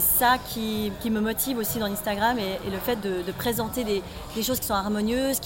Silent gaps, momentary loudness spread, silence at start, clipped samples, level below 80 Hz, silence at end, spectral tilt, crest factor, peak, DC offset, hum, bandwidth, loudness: none; 6 LU; 0 s; under 0.1%; -44 dBFS; 0 s; -3.5 dB/octave; 16 dB; -10 dBFS; under 0.1%; none; 16.5 kHz; -26 LUFS